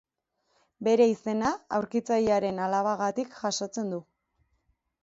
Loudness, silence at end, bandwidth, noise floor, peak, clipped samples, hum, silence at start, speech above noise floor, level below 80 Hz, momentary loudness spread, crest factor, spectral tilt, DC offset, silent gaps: -28 LUFS; 1 s; 7.8 kHz; -76 dBFS; -10 dBFS; under 0.1%; none; 0.8 s; 50 dB; -64 dBFS; 9 LU; 18 dB; -5 dB/octave; under 0.1%; none